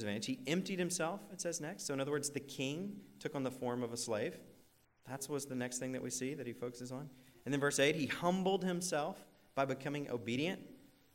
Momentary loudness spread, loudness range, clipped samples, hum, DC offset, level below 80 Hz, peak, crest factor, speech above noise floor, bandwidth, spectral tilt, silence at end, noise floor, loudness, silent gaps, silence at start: 12 LU; 6 LU; under 0.1%; none; under 0.1%; -76 dBFS; -20 dBFS; 20 dB; 30 dB; 16 kHz; -4 dB/octave; 0.3 s; -68 dBFS; -39 LUFS; none; 0 s